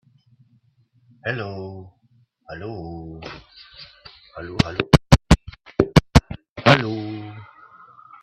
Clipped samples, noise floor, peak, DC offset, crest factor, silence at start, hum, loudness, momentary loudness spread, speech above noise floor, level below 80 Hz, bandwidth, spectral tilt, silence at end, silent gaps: under 0.1%; -61 dBFS; 0 dBFS; under 0.1%; 22 dB; 1.25 s; none; -20 LUFS; 25 LU; 38 dB; -32 dBFS; 13.5 kHz; -6 dB/octave; 0.8 s; 6.49-6.56 s